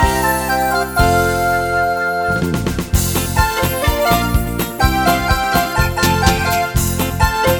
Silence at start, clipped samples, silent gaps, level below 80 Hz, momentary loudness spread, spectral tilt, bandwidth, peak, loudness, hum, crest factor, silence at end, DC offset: 0 s; under 0.1%; none; -24 dBFS; 4 LU; -4.5 dB/octave; over 20 kHz; 0 dBFS; -16 LUFS; none; 16 dB; 0 s; under 0.1%